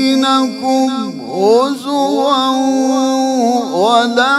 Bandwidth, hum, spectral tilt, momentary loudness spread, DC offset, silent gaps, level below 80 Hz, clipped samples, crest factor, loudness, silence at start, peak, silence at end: 13.5 kHz; none; -3.5 dB/octave; 5 LU; under 0.1%; none; -66 dBFS; under 0.1%; 12 dB; -13 LUFS; 0 s; 0 dBFS; 0 s